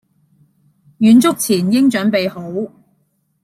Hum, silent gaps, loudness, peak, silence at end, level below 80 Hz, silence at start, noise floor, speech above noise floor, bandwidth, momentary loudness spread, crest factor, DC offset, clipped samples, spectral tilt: none; none; -14 LUFS; -2 dBFS; 0.75 s; -60 dBFS; 1 s; -63 dBFS; 50 dB; 15 kHz; 14 LU; 14 dB; under 0.1%; under 0.1%; -5 dB/octave